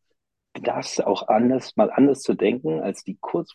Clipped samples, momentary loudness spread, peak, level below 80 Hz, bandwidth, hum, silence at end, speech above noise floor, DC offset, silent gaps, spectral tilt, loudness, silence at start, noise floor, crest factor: under 0.1%; 10 LU; -4 dBFS; -66 dBFS; 11 kHz; none; 0.1 s; 55 dB; under 0.1%; none; -5.5 dB/octave; -22 LUFS; 0.55 s; -77 dBFS; 18 dB